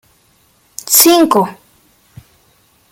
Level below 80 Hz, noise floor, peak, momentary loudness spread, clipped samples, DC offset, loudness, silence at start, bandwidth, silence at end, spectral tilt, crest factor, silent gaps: -58 dBFS; -54 dBFS; 0 dBFS; 23 LU; 0.1%; under 0.1%; -9 LUFS; 0.85 s; 17 kHz; 1.4 s; -2.5 dB/octave; 16 dB; none